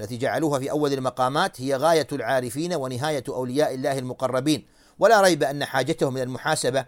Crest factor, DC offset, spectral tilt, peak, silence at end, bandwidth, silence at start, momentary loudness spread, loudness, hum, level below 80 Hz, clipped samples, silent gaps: 18 dB; under 0.1%; -4.5 dB/octave; -4 dBFS; 0 s; 17 kHz; 0 s; 8 LU; -23 LUFS; none; -60 dBFS; under 0.1%; none